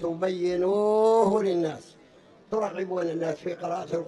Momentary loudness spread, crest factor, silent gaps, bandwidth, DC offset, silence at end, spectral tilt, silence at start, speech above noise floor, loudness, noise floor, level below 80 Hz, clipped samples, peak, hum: 11 LU; 18 dB; none; 10.5 kHz; under 0.1%; 0 s; -6.5 dB/octave; 0 s; 29 dB; -26 LUFS; -54 dBFS; -66 dBFS; under 0.1%; -8 dBFS; none